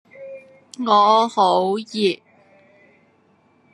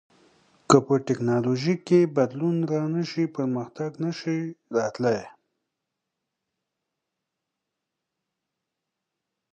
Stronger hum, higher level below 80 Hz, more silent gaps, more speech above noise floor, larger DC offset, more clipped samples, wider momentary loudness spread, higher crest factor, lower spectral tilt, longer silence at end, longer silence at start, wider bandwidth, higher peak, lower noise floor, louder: neither; second, -80 dBFS vs -68 dBFS; neither; second, 41 dB vs 60 dB; neither; neither; first, 24 LU vs 10 LU; second, 18 dB vs 26 dB; second, -5 dB/octave vs -6.5 dB/octave; second, 1.6 s vs 4.25 s; second, 0.2 s vs 0.7 s; first, 11.5 kHz vs 9.2 kHz; about the same, -2 dBFS vs -2 dBFS; second, -58 dBFS vs -84 dBFS; first, -18 LUFS vs -25 LUFS